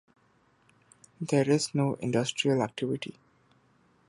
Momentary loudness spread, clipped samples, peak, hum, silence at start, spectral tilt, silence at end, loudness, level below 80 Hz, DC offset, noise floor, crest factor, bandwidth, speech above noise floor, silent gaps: 10 LU; under 0.1%; -12 dBFS; none; 1.2 s; -5.5 dB/octave; 0.95 s; -29 LUFS; -70 dBFS; under 0.1%; -66 dBFS; 20 dB; 11.5 kHz; 38 dB; none